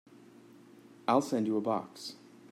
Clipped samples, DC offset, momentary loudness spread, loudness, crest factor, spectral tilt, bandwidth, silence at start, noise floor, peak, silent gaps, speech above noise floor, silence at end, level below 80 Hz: under 0.1%; under 0.1%; 16 LU; -32 LUFS; 20 dB; -5.5 dB/octave; 15.5 kHz; 1.1 s; -56 dBFS; -14 dBFS; none; 25 dB; 0.05 s; -84 dBFS